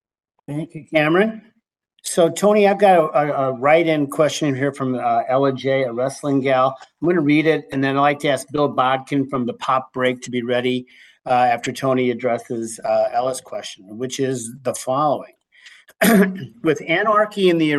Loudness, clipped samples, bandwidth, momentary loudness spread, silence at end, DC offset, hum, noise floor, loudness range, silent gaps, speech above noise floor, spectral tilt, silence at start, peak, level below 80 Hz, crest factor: -19 LUFS; under 0.1%; 13 kHz; 11 LU; 0 s; under 0.1%; none; -65 dBFS; 5 LU; none; 47 dB; -5 dB/octave; 0.5 s; -2 dBFS; -64 dBFS; 16 dB